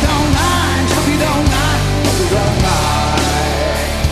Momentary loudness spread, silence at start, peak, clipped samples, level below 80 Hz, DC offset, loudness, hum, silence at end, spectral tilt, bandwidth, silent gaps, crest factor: 2 LU; 0 s; 0 dBFS; under 0.1%; -22 dBFS; under 0.1%; -14 LUFS; none; 0 s; -4.5 dB/octave; 14 kHz; none; 12 dB